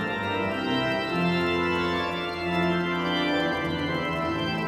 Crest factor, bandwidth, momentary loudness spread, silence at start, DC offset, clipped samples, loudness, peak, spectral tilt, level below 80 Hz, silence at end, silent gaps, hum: 14 dB; 15 kHz; 3 LU; 0 s; under 0.1%; under 0.1%; -26 LUFS; -12 dBFS; -6 dB/octave; -52 dBFS; 0 s; none; none